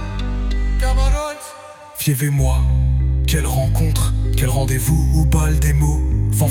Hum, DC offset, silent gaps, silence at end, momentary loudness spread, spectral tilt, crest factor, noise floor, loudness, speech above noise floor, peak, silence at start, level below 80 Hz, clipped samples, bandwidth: none; under 0.1%; none; 0 s; 8 LU; -5.5 dB/octave; 12 dB; -37 dBFS; -18 LUFS; 22 dB; -4 dBFS; 0 s; -18 dBFS; under 0.1%; 18.5 kHz